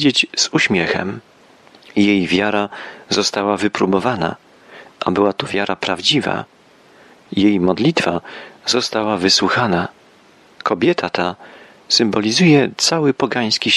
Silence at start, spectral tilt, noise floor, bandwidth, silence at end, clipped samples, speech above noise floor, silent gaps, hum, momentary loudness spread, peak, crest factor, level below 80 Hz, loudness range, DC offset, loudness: 0 s; -4 dB/octave; -49 dBFS; 12.5 kHz; 0 s; under 0.1%; 32 dB; none; none; 12 LU; 0 dBFS; 18 dB; -56 dBFS; 3 LU; under 0.1%; -17 LUFS